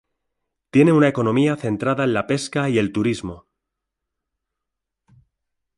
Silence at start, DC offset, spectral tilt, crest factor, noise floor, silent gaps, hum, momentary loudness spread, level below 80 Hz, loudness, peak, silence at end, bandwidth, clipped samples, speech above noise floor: 0.75 s; under 0.1%; -6.5 dB/octave; 20 dB; -82 dBFS; none; none; 8 LU; -54 dBFS; -19 LUFS; -2 dBFS; 2.4 s; 11.5 kHz; under 0.1%; 63 dB